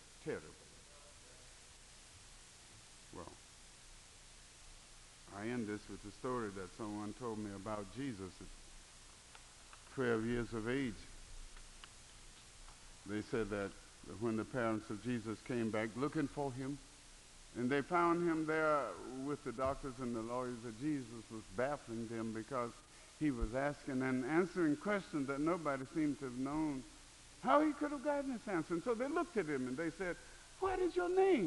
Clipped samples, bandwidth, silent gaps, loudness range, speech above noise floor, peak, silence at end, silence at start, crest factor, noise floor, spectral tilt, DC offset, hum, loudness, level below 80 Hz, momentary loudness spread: under 0.1%; 11.5 kHz; none; 12 LU; 21 dB; -18 dBFS; 0 s; 0 s; 22 dB; -59 dBFS; -6 dB/octave; under 0.1%; none; -40 LUFS; -60 dBFS; 22 LU